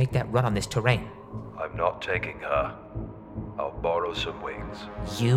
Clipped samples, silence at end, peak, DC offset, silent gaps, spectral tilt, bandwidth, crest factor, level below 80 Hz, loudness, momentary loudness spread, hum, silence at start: under 0.1%; 0 s; -8 dBFS; under 0.1%; none; -6 dB/octave; 13.5 kHz; 20 dB; -44 dBFS; -29 LUFS; 13 LU; none; 0 s